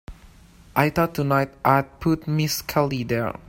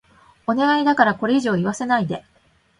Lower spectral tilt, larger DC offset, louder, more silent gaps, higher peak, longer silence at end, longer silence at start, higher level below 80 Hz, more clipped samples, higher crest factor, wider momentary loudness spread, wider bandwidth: about the same, -5.5 dB/octave vs -5.5 dB/octave; neither; second, -22 LUFS vs -19 LUFS; neither; about the same, -2 dBFS vs 0 dBFS; second, 0.1 s vs 0.6 s; second, 0.1 s vs 0.5 s; first, -46 dBFS vs -60 dBFS; neither; about the same, 22 dB vs 20 dB; second, 4 LU vs 11 LU; first, 16.5 kHz vs 11 kHz